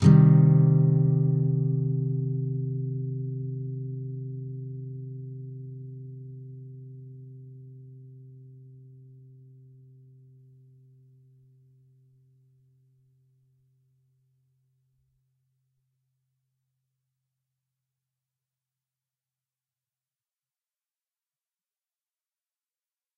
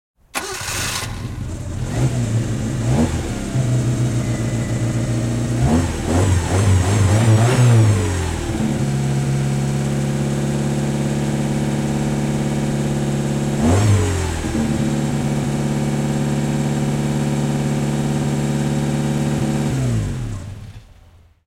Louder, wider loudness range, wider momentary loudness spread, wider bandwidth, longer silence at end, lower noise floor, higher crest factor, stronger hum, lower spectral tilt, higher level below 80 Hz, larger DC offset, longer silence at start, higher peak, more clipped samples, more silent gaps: second, -25 LUFS vs -19 LUFS; first, 26 LU vs 5 LU; first, 27 LU vs 8 LU; second, 3.6 kHz vs 16 kHz; first, 14.75 s vs 0.6 s; first, under -90 dBFS vs -48 dBFS; first, 24 dB vs 14 dB; neither; first, -12.5 dB/octave vs -6 dB/octave; second, -62 dBFS vs -34 dBFS; neither; second, 0 s vs 0.35 s; about the same, -6 dBFS vs -4 dBFS; neither; neither